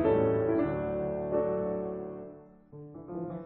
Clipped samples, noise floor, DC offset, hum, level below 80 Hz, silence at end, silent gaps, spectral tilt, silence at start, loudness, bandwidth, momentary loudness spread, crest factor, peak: under 0.1%; -50 dBFS; under 0.1%; none; -54 dBFS; 0 s; none; -8.5 dB/octave; 0 s; -31 LUFS; 4.2 kHz; 21 LU; 16 dB; -14 dBFS